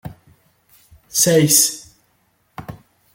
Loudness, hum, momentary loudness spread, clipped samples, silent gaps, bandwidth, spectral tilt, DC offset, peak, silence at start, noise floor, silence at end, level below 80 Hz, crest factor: -14 LUFS; none; 26 LU; under 0.1%; none; 17 kHz; -3 dB/octave; under 0.1%; -2 dBFS; 0.05 s; -63 dBFS; 0.4 s; -54 dBFS; 20 dB